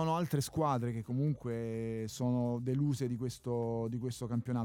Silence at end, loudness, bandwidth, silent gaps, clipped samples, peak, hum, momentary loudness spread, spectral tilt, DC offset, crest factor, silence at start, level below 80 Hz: 0 s; -35 LUFS; 17.5 kHz; none; under 0.1%; -20 dBFS; none; 5 LU; -7 dB/octave; under 0.1%; 14 dB; 0 s; -64 dBFS